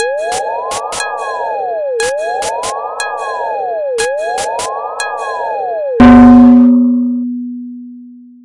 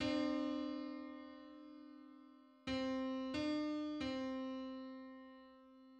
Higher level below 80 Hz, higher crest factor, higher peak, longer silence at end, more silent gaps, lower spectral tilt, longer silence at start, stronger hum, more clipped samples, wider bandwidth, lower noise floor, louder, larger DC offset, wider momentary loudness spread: first, -36 dBFS vs -70 dBFS; about the same, 12 dB vs 16 dB; first, 0 dBFS vs -28 dBFS; first, 0.2 s vs 0 s; neither; about the same, -5 dB/octave vs -5.5 dB/octave; about the same, 0 s vs 0 s; neither; neither; first, 11.5 kHz vs 9 kHz; second, -34 dBFS vs -63 dBFS; first, -12 LUFS vs -43 LUFS; neither; second, 15 LU vs 20 LU